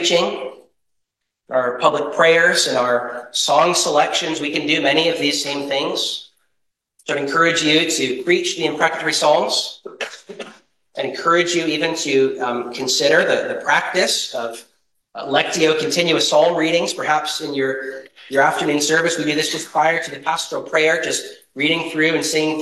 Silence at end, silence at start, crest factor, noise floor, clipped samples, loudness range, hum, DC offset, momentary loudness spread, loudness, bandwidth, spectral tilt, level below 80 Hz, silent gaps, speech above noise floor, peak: 0 s; 0 s; 18 dB; -76 dBFS; under 0.1%; 3 LU; none; under 0.1%; 13 LU; -17 LUFS; 13 kHz; -2.5 dB/octave; -68 dBFS; none; 57 dB; 0 dBFS